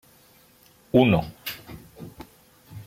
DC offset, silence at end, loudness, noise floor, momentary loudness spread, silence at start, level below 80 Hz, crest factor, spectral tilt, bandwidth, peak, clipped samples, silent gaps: under 0.1%; 0.05 s; -23 LUFS; -56 dBFS; 26 LU; 0.95 s; -52 dBFS; 22 dB; -7 dB/octave; 16.5 kHz; -6 dBFS; under 0.1%; none